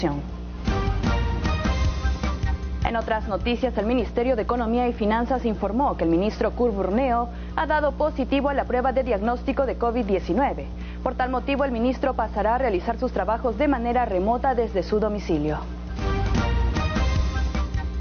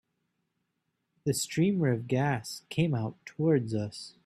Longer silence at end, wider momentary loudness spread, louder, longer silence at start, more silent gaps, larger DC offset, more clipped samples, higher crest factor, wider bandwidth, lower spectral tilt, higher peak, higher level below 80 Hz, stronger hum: second, 0 s vs 0.15 s; second, 5 LU vs 9 LU; first, -24 LUFS vs -30 LUFS; second, 0 s vs 1.25 s; neither; neither; neither; about the same, 16 dB vs 18 dB; second, 6.8 kHz vs 14 kHz; about the same, -6 dB/octave vs -6 dB/octave; first, -8 dBFS vs -14 dBFS; first, -30 dBFS vs -66 dBFS; first, 60 Hz at -35 dBFS vs none